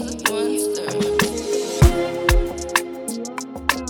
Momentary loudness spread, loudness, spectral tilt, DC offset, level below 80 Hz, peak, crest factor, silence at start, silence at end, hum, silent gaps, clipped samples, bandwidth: 11 LU; -21 LUFS; -4.5 dB/octave; under 0.1%; -26 dBFS; 0 dBFS; 20 dB; 0 s; 0 s; none; none; under 0.1%; 19 kHz